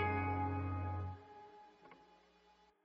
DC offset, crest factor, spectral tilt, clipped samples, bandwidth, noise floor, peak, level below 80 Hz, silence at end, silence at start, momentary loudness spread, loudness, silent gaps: under 0.1%; 18 dB; -6.5 dB/octave; under 0.1%; 5.4 kHz; -70 dBFS; -26 dBFS; -64 dBFS; 0.8 s; 0 s; 24 LU; -41 LUFS; none